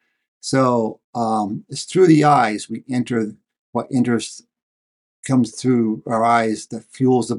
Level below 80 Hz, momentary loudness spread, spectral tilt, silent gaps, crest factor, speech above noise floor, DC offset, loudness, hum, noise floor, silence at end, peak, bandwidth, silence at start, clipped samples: -66 dBFS; 14 LU; -6 dB/octave; 1.04-1.13 s, 3.59-3.73 s, 4.62-5.23 s; 16 dB; over 72 dB; under 0.1%; -19 LUFS; none; under -90 dBFS; 0 s; -2 dBFS; 11.5 kHz; 0.45 s; under 0.1%